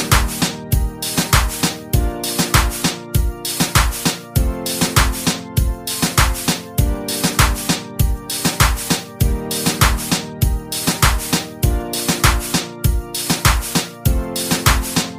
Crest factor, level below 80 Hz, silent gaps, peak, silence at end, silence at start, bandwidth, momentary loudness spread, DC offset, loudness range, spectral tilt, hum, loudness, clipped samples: 18 dB; -22 dBFS; none; 0 dBFS; 0 s; 0 s; 16 kHz; 5 LU; under 0.1%; 1 LU; -3.5 dB/octave; none; -18 LUFS; under 0.1%